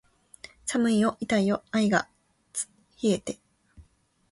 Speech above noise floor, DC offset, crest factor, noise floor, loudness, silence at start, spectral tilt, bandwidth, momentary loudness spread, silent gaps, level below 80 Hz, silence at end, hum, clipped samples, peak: 38 dB; under 0.1%; 20 dB; -63 dBFS; -27 LUFS; 0.65 s; -4.5 dB/octave; 11.5 kHz; 17 LU; none; -62 dBFS; 0.5 s; none; under 0.1%; -10 dBFS